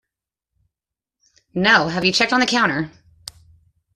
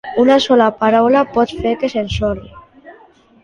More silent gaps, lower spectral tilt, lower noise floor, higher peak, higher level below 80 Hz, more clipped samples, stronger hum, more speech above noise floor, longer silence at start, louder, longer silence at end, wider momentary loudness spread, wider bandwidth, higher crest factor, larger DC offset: neither; second, -3.5 dB/octave vs -6 dB/octave; first, -87 dBFS vs -47 dBFS; about the same, -2 dBFS vs -2 dBFS; second, -56 dBFS vs -38 dBFS; neither; neither; first, 70 dB vs 33 dB; first, 1.55 s vs 0.05 s; second, -17 LUFS vs -14 LUFS; first, 1.05 s vs 0.5 s; first, 24 LU vs 8 LU; first, 13.5 kHz vs 10 kHz; first, 20 dB vs 14 dB; neither